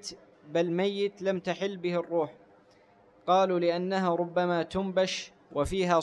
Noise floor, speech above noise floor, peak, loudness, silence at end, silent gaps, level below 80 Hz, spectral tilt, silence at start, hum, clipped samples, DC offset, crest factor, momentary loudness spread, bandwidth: -60 dBFS; 32 dB; -12 dBFS; -29 LUFS; 0 s; none; -54 dBFS; -5.5 dB/octave; 0.05 s; none; under 0.1%; under 0.1%; 18 dB; 8 LU; 12 kHz